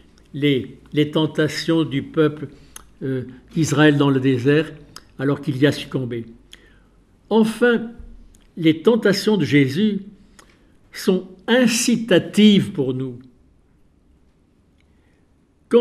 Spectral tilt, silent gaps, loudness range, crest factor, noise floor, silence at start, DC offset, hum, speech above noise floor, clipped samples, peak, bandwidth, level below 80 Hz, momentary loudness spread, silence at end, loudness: -5.5 dB/octave; none; 4 LU; 18 dB; -58 dBFS; 0.35 s; under 0.1%; none; 39 dB; under 0.1%; -2 dBFS; 14.5 kHz; -54 dBFS; 15 LU; 0 s; -19 LUFS